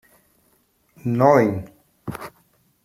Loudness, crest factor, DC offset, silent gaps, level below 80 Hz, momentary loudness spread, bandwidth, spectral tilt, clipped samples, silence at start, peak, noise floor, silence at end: -19 LUFS; 22 dB; under 0.1%; none; -58 dBFS; 22 LU; 15.5 kHz; -8 dB/octave; under 0.1%; 1.05 s; -2 dBFS; -63 dBFS; 0.55 s